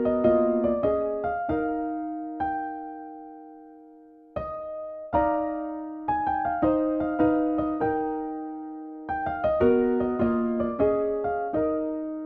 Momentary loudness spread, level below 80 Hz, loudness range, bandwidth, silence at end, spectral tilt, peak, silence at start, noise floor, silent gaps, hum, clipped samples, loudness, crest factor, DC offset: 15 LU; -50 dBFS; 7 LU; 4.1 kHz; 0 s; -10.5 dB/octave; -10 dBFS; 0 s; -51 dBFS; none; none; under 0.1%; -26 LUFS; 16 dB; under 0.1%